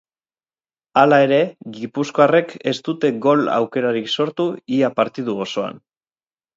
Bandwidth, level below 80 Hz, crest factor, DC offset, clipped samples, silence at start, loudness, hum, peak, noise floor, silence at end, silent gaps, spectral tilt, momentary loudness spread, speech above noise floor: 7.8 kHz; -68 dBFS; 18 dB; under 0.1%; under 0.1%; 0.95 s; -18 LUFS; none; 0 dBFS; under -90 dBFS; 0.8 s; none; -6 dB/octave; 11 LU; over 72 dB